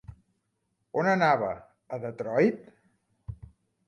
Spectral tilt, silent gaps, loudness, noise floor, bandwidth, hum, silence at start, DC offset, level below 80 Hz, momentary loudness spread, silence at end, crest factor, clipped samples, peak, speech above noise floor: -7 dB/octave; none; -27 LUFS; -78 dBFS; 10.5 kHz; none; 0.1 s; under 0.1%; -58 dBFS; 22 LU; 0.55 s; 20 dB; under 0.1%; -10 dBFS; 51 dB